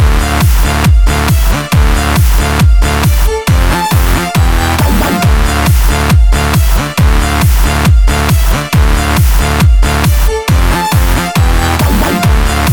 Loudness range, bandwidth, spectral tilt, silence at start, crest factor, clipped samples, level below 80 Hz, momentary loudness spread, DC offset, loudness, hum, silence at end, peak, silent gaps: 0 LU; over 20 kHz; -5 dB/octave; 0 s; 8 dB; under 0.1%; -10 dBFS; 2 LU; under 0.1%; -10 LUFS; none; 0 s; 0 dBFS; none